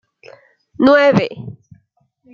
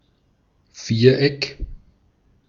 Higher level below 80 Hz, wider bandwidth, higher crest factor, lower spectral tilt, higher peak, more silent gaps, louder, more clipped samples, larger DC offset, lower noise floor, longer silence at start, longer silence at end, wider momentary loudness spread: second, -56 dBFS vs -40 dBFS; about the same, 7 kHz vs 7.4 kHz; about the same, 18 dB vs 22 dB; about the same, -7 dB/octave vs -6.5 dB/octave; about the same, 0 dBFS vs -2 dBFS; neither; first, -13 LUFS vs -18 LUFS; neither; neither; about the same, -60 dBFS vs -62 dBFS; about the same, 0.8 s vs 0.75 s; about the same, 0.8 s vs 0.7 s; about the same, 23 LU vs 22 LU